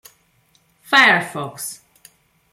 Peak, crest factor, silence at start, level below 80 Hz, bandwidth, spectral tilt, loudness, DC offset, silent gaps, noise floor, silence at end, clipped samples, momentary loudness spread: 0 dBFS; 20 dB; 0.9 s; -68 dBFS; 16.5 kHz; -2.5 dB/octave; -15 LUFS; under 0.1%; none; -60 dBFS; 0.75 s; under 0.1%; 18 LU